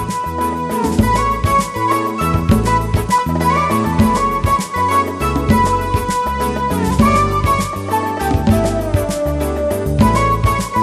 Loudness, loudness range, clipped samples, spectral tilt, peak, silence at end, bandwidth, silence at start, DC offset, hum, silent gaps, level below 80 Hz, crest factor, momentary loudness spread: -16 LUFS; 1 LU; under 0.1%; -6 dB/octave; 0 dBFS; 0 s; 14 kHz; 0 s; under 0.1%; none; none; -26 dBFS; 14 dB; 5 LU